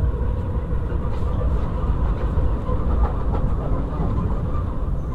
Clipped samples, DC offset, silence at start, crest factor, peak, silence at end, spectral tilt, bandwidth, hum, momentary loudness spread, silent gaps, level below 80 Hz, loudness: under 0.1%; 0.4%; 0 s; 12 dB; -8 dBFS; 0 s; -10 dB/octave; 4.3 kHz; none; 3 LU; none; -22 dBFS; -25 LUFS